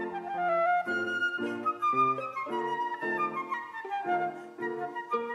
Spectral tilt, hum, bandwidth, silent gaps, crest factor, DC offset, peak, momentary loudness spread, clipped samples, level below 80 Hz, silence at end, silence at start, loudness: -5.5 dB/octave; none; 12 kHz; none; 14 dB; under 0.1%; -16 dBFS; 9 LU; under 0.1%; -84 dBFS; 0 s; 0 s; -31 LUFS